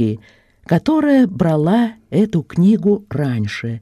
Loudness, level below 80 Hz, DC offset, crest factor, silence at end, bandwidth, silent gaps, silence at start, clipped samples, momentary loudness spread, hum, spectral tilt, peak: -16 LUFS; -50 dBFS; under 0.1%; 14 dB; 0 s; 12.5 kHz; none; 0 s; under 0.1%; 7 LU; none; -8.5 dB/octave; -2 dBFS